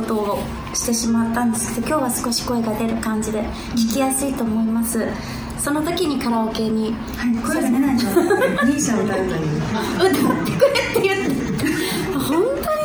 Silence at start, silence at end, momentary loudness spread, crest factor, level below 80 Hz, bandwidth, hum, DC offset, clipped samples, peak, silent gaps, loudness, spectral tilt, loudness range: 0 s; 0 s; 6 LU; 16 dB; -40 dBFS; over 20 kHz; none; under 0.1%; under 0.1%; -2 dBFS; none; -20 LUFS; -4.5 dB/octave; 3 LU